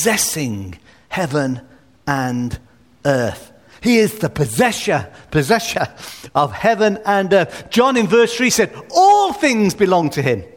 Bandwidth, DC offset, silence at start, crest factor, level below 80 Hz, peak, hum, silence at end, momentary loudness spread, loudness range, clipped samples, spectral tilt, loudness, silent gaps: 19 kHz; 0.1%; 0 s; 16 dB; -46 dBFS; 0 dBFS; none; 0.1 s; 11 LU; 7 LU; under 0.1%; -4.5 dB/octave; -17 LUFS; none